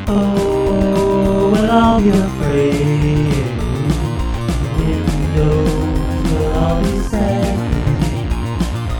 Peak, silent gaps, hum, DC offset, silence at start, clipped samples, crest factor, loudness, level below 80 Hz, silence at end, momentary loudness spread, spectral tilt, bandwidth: 0 dBFS; none; none; under 0.1%; 0 s; under 0.1%; 14 dB; -16 LUFS; -22 dBFS; 0 s; 7 LU; -7 dB/octave; 18.5 kHz